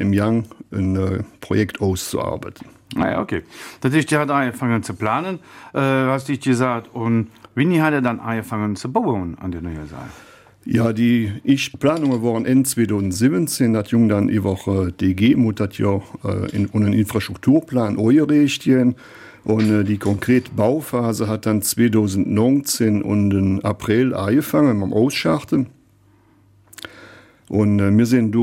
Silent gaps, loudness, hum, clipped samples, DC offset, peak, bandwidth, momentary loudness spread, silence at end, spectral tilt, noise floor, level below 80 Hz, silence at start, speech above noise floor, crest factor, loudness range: none; -19 LUFS; none; under 0.1%; under 0.1%; -4 dBFS; 16.5 kHz; 11 LU; 0 s; -6 dB/octave; -54 dBFS; -50 dBFS; 0 s; 36 dB; 14 dB; 4 LU